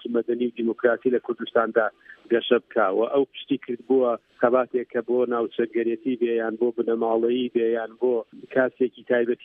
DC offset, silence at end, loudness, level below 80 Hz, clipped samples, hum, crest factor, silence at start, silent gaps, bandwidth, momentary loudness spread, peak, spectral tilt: under 0.1%; 0.1 s; -24 LUFS; -76 dBFS; under 0.1%; none; 18 dB; 0.05 s; none; 3.8 kHz; 5 LU; -4 dBFS; -8.5 dB/octave